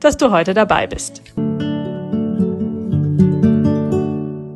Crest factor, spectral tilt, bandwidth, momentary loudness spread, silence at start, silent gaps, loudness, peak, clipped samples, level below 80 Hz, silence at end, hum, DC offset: 16 dB; -6.5 dB/octave; 12.5 kHz; 10 LU; 0 s; none; -17 LUFS; 0 dBFS; under 0.1%; -42 dBFS; 0 s; none; under 0.1%